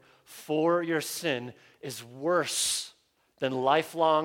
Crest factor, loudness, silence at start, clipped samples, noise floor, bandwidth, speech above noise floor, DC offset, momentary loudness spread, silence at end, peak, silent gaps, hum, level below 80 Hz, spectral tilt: 18 dB; -28 LUFS; 0.3 s; under 0.1%; -64 dBFS; 17.5 kHz; 36 dB; under 0.1%; 18 LU; 0 s; -10 dBFS; none; none; -76 dBFS; -3 dB/octave